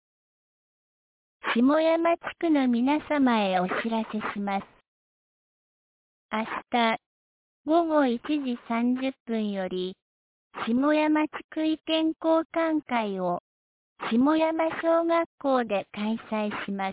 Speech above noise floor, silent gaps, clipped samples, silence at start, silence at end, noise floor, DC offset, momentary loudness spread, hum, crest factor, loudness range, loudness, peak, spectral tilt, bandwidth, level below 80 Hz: over 65 dB; 4.88-6.29 s, 7.06-7.65 s, 9.20-9.26 s, 10.02-10.51 s, 11.44-11.49 s, 12.45-12.50 s, 13.40-13.96 s, 15.26-15.38 s; under 0.1%; 1.45 s; 0 s; under -90 dBFS; under 0.1%; 9 LU; none; 16 dB; 6 LU; -26 LUFS; -12 dBFS; -9.5 dB/octave; 4 kHz; -68 dBFS